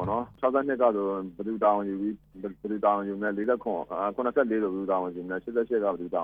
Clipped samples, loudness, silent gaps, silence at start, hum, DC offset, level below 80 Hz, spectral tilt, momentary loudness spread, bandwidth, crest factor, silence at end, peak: under 0.1%; -28 LUFS; none; 0 s; none; under 0.1%; -62 dBFS; -10 dB/octave; 9 LU; 4.6 kHz; 18 dB; 0 s; -10 dBFS